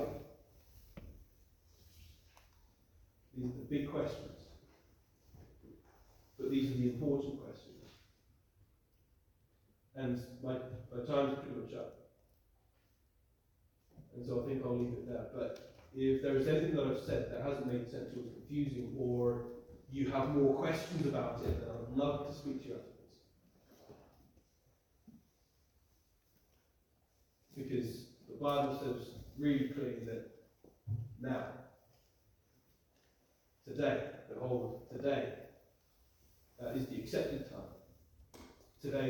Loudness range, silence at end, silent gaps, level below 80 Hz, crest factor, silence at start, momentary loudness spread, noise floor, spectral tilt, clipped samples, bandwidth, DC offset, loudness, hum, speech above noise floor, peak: 11 LU; 0 s; none; -62 dBFS; 20 dB; 0 s; 20 LU; -75 dBFS; -7.5 dB/octave; under 0.1%; 20 kHz; under 0.1%; -39 LUFS; none; 37 dB; -20 dBFS